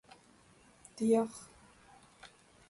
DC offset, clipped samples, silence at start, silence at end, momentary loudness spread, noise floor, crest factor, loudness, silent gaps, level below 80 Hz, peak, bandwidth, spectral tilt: under 0.1%; under 0.1%; 0.95 s; 0.45 s; 26 LU; -63 dBFS; 20 dB; -33 LUFS; none; -74 dBFS; -18 dBFS; 11.5 kHz; -6 dB/octave